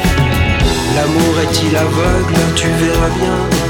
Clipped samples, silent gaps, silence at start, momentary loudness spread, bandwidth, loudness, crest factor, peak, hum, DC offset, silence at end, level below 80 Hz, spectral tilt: under 0.1%; none; 0 s; 1 LU; over 20 kHz; -13 LUFS; 12 dB; 0 dBFS; none; under 0.1%; 0 s; -22 dBFS; -5 dB/octave